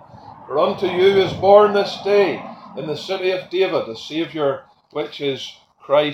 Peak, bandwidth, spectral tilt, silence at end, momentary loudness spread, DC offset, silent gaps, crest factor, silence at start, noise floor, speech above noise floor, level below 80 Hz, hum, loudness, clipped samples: 0 dBFS; 11.5 kHz; -5.5 dB/octave; 0 s; 17 LU; under 0.1%; none; 18 dB; 0.15 s; -41 dBFS; 23 dB; -58 dBFS; none; -18 LUFS; under 0.1%